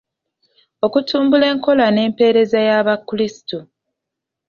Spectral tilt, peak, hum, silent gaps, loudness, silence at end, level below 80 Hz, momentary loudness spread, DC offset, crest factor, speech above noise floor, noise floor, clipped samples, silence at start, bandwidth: -6 dB/octave; -2 dBFS; none; none; -15 LUFS; 0.85 s; -60 dBFS; 8 LU; under 0.1%; 14 dB; 67 dB; -82 dBFS; under 0.1%; 0.85 s; 7 kHz